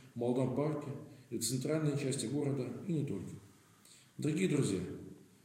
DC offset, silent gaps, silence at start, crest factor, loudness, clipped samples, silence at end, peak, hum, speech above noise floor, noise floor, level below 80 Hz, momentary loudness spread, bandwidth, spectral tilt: under 0.1%; none; 0 s; 16 dB; -36 LUFS; under 0.1%; 0.2 s; -20 dBFS; none; 27 dB; -62 dBFS; -76 dBFS; 16 LU; 16 kHz; -6 dB/octave